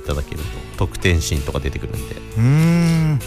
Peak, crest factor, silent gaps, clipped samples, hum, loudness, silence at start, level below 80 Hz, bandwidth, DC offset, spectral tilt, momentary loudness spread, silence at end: -4 dBFS; 14 dB; none; under 0.1%; none; -19 LUFS; 0 s; -28 dBFS; 15 kHz; under 0.1%; -6 dB/octave; 14 LU; 0 s